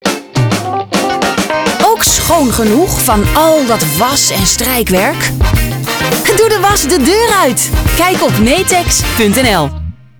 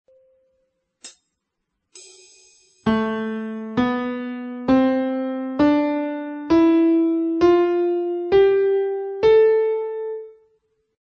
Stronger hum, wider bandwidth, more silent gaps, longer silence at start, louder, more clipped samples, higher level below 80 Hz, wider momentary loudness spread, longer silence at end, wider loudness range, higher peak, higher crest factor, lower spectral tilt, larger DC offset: neither; first, over 20 kHz vs 8.6 kHz; neither; second, 0.05 s vs 1.05 s; first, -10 LUFS vs -20 LUFS; neither; first, -22 dBFS vs -52 dBFS; second, 5 LU vs 12 LU; second, 0.25 s vs 0.7 s; second, 1 LU vs 10 LU; first, -2 dBFS vs -6 dBFS; about the same, 10 dB vs 14 dB; second, -3.5 dB/octave vs -6.5 dB/octave; neither